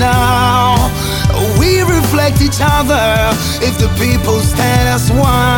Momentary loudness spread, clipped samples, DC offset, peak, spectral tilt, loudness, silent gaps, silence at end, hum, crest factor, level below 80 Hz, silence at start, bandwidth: 3 LU; under 0.1%; 0.1%; 0 dBFS; -5 dB/octave; -12 LUFS; none; 0 s; none; 10 dB; -20 dBFS; 0 s; 19.5 kHz